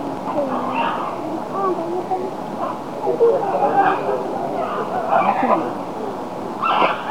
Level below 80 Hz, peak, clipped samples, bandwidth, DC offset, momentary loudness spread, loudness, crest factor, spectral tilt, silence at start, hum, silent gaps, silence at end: -62 dBFS; -2 dBFS; under 0.1%; 17 kHz; 0.8%; 10 LU; -21 LUFS; 18 dB; -6 dB/octave; 0 s; none; none; 0 s